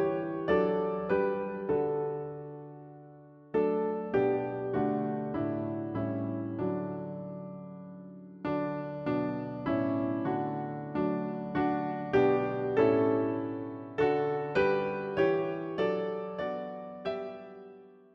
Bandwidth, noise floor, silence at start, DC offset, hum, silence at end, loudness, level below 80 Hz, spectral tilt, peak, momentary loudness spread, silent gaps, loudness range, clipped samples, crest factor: 6.2 kHz; -53 dBFS; 0 s; under 0.1%; none; 0.2 s; -31 LUFS; -62 dBFS; -9 dB/octave; -12 dBFS; 15 LU; none; 7 LU; under 0.1%; 18 dB